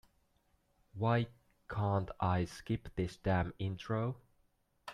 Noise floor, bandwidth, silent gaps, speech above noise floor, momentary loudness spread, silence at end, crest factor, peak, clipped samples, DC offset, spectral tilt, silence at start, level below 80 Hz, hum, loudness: -75 dBFS; 11.5 kHz; none; 40 dB; 10 LU; 0 s; 18 dB; -18 dBFS; under 0.1%; under 0.1%; -7.5 dB/octave; 0.95 s; -58 dBFS; none; -37 LUFS